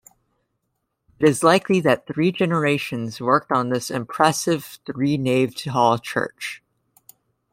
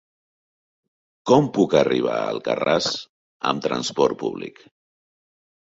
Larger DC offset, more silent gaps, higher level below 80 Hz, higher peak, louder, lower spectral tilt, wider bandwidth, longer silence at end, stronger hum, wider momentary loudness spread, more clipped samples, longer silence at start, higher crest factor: neither; second, none vs 3.09-3.40 s; about the same, -62 dBFS vs -60 dBFS; about the same, -2 dBFS vs -2 dBFS; about the same, -21 LUFS vs -21 LUFS; about the same, -5 dB/octave vs -5 dB/octave; first, 16 kHz vs 8 kHz; second, 0.95 s vs 1.1 s; neither; about the same, 10 LU vs 12 LU; neither; about the same, 1.2 s vs 1.25 s; about the same, 20 dB vs 20 dB